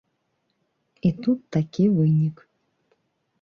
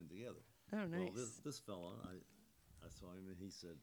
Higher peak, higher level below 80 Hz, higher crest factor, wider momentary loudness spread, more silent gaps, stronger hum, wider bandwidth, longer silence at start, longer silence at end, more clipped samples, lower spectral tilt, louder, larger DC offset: first, -10 dBFS vs -32 dBFS; first, -58 dBFS vs -74 dBFS; about the same, 16 dB vs 18 dB; second, 7 LU vs 17 LU; neither; neither; second, 6.6 kHz vs over 20 kHz; first, 1.05 s vs 0 s; first, 1.1 s vs 0 s; neither; first, -9.5 dB/octave vs -5 dB/octave; first, -23 LUFS vs -50 LUFS; neither